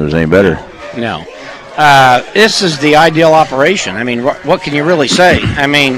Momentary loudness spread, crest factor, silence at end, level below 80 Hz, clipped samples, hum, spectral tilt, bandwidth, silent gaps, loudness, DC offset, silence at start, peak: 14 LU; 10 dB; 0 s; -34 dBFS; 1%; none; -4.5 dB/octave; 16.5 kHz; none; -9 LUFS; under 0.1%; 0 s; 0 dBFS